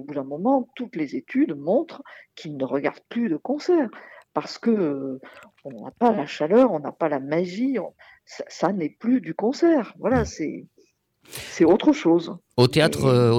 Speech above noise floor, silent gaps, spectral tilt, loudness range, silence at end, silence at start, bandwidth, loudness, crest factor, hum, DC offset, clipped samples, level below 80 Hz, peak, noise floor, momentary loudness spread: 39 dB; none; -6.5 dB/octave; 4 LU; 0 s; 0 s; 15.5 kHz; -23 LUFS; 16 dB; none; under 0.1%; under 0.1%; -52 dBFS; -8 dBFS; -62 dBFS; 19 LU